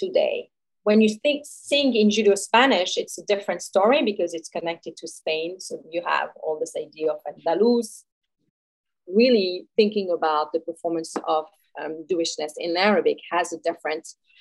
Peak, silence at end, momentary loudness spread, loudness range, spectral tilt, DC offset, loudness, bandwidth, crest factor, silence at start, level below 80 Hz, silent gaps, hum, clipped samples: -4 dBFS; 0.3 s; 13 LU; 6 LU; -4 dB/octave; under 0.1%; -23 LUFS; 12.5 kHz; 20 dB; 0 s; -80 dBFS; 8.12-8.21 s, 8.50-8.84 s; none; under 0.1%